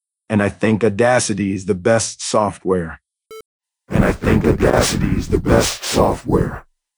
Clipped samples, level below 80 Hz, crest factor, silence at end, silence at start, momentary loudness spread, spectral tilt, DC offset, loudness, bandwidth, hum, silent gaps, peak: under 0.1%; -30 dBFS; 16 dB; 0.35 s; 0.3 s; 6 LU; -5 dB/octave; under 0.1%; -17 LUFS; over 20 kHz; none; 3.45-3.60 s; 0 dBFS